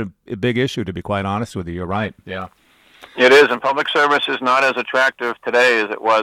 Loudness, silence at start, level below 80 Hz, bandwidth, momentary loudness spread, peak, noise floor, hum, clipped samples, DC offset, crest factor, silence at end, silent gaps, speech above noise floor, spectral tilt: -17 LUFS; 0 s; -52 dBFS; 15.5 kHz; 16 LU; 0 dBFS; -46 dBFS; none; under 0.1%; under 0.1%; 16 dB; 0 s; none; 29 dB; -4.5 dB/octave